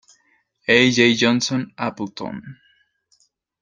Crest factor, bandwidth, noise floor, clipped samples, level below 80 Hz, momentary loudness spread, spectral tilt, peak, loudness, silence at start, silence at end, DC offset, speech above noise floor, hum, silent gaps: 20 dB; 9.2 kHz; -63 dBFS; under 0.1%; -60 dBFS; 17 LU; -4 dB/octave; -2 dBFS; -18 LUFS; 0.7 s; 1.1 s; under 0.1%; 45 dB; none; none